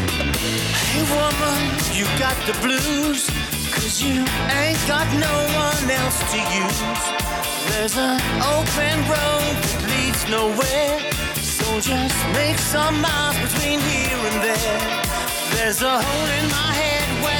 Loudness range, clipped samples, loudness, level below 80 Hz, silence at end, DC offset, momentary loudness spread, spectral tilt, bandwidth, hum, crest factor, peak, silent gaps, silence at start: 1 LU; under 0.1%; -19 LUFS; -34 dBFS; 0 s; under 0.1%; 3 LU; -3 dB/octave; over 20 kHz; none; 14 dB; -6 dBFS; none; 0 s